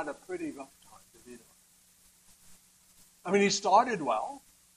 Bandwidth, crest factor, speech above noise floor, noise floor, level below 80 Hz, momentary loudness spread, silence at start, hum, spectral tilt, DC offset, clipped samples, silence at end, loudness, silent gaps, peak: 15 kHz; 22 dB; 34 dB; -63 dBFS; -72 dBFS; 26 LU; 0 s; none; -3.5 dB/octave; under 0.1%; under 0.1%; 0.4 s; -29 LUFS; none; -10 dBFS